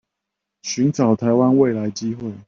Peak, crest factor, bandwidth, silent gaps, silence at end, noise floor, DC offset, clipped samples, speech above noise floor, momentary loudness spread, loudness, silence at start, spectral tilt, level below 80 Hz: -4 dBFS; 16 dB; 7.4 kHz; none; 0.05 s; -81 dBFS; under 0.1%; under 0.1%; 63 dB; 11 LU; -19 LUFS; 0.65 s; -6.5 dB/octave; -60 dBFS